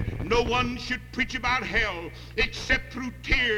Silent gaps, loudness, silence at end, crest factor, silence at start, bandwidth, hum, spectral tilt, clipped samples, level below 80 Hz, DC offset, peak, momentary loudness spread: none; -27 LUFS; 0 s; 18 dB; 0 s; 16.5 kHz; 60 Hz at -45 dBFS; -4.5 dB/octave; under 0.1%; -36 dBFS; under 0.1%; -8 dBFS; 10 LU